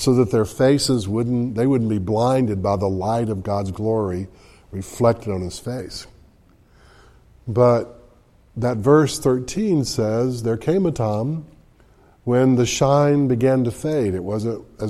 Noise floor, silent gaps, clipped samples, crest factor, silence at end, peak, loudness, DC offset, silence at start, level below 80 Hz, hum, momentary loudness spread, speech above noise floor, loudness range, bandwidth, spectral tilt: -53 dBFS; none; under 0.1%; 18 dB; 0 s; -2 dBFS; -20 LUFS; under 0.1%; 0 s; -48 dBFS; none; 13 LU; 34 dB; 5 LU; 14 kHz; -6.5 dB/octave